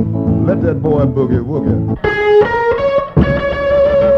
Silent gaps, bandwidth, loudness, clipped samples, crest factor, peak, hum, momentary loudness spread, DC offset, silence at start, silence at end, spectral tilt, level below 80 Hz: none; 6.6 kHz; -13 LUFS; under 0.1%; 12 dB; 0 dBFS; none; 5 LU; under 0.1%; 0 s; 0 s; -9 dB/octave; -28 dBFS